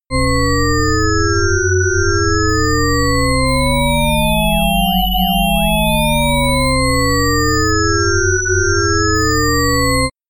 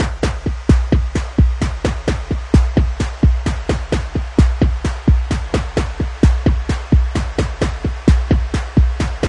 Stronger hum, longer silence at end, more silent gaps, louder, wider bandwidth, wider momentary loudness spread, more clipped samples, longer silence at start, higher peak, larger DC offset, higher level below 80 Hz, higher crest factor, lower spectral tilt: neither; first, 0.2 s vs 0 s; neither; first, -14 LUFS vs -18 LUFS; first, 17 kHz vs 10.5 kHz; second, 1 LU vs 6 LU; neither; about the same, 0.1 s vs 0 s; about the same, -2 dBFS vs 0 dBFS; neither; about the same, -22 dBFS vs -18 dBFS; about the same, 12 dB vs 16 dB; second, -4 dB/octave vs -7 dB/octave